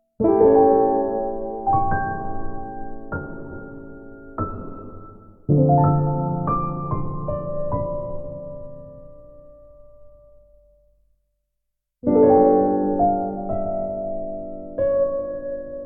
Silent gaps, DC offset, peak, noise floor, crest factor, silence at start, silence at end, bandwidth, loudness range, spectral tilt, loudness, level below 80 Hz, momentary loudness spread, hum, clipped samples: none; under 0.1%; -4 dBFS; -77 dBFS; 18 dB; 0.2 s; 0 s; 2.5 kHz; 13 LU; -14.5 dB/octave; -21 LUFS; -40 dBFS; 22 LU; none; under 0.1%